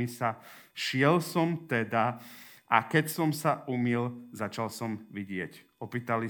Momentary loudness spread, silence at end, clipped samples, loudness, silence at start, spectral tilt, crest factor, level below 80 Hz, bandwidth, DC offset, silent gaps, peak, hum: 17 LU; 0 s; under 0.1%; -30 LUFS; 0 s; -5.5 dB/octave; 24 dB; -78 dBFS; over 20 kHz; under 0.1%; none; -8 dBFS; none